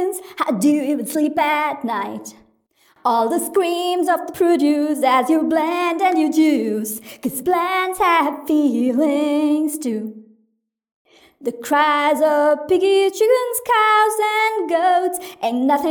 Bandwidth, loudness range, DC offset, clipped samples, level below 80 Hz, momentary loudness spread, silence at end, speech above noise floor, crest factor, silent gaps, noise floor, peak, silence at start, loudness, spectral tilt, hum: over 20 kHz; 5 LU; under 0.1%; under 0.1%; -64 dBFS; 9 LU; 0 s; 51 dB; 14 dB; 10.94-11.05 s; -69 dBFS; -4 dBFS; 0 s; -18 LUFS; -3.5 dB/octave; none